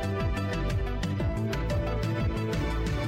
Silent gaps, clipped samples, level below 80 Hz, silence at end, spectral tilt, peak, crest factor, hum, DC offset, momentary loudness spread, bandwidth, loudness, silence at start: none; under 0.1%; -34 dBFS; 0 s; -7 dB/octave; -18 dBFS; 10 dB; none; under 0.1%; 1 LU; 15.5 kHz; -30 LUFS; 0 s